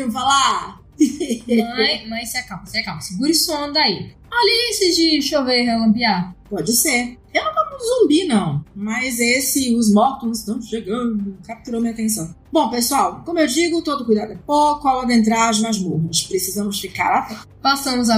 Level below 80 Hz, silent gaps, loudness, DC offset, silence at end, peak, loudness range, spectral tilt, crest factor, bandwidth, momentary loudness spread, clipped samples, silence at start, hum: -48 dBFS; none; -18 LUFS; under 0.1%; 0 s; -4 dBFS; 3 LU; -3.5 dB/octave; 16 dB; 15.5 kHz; 10 LU; under 0.1%; 0 s; none